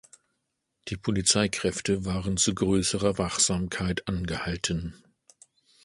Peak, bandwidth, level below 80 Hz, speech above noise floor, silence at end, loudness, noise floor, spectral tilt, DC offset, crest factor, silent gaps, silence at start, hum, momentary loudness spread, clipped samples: -8 dBFS; 11.5 kHz; -46 dBFS; 53 dB; 0.9 s; -26 LUFS; -80 dBFS; -3.5 dB/octave; under 0.1%; 20 dB; none; 0.85 s; none; 10 LU; under 0.1%